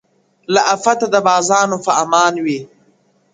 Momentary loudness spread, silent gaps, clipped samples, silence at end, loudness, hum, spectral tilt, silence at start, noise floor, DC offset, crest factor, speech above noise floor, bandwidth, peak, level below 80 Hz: 7 LU; none; under 0.1%; 0.7 s; -14 LUFS; none; -3 dB/octave; 0.5 s; -56 dBFS; under 0.1%; 16 dB; 42 dB; 9.6 kHz; 0 dBFS; -62 dBFS